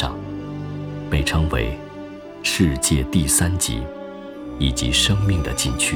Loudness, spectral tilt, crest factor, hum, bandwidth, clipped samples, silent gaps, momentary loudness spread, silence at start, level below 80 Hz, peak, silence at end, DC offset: -20 LUFS; -3.5 dB/octave; 18 dB; none; 19.5 kHz; under 0.1%; none; 17 LU; 0 s; -30 dBFS; -4 dBFS; 0 s; under 0.1%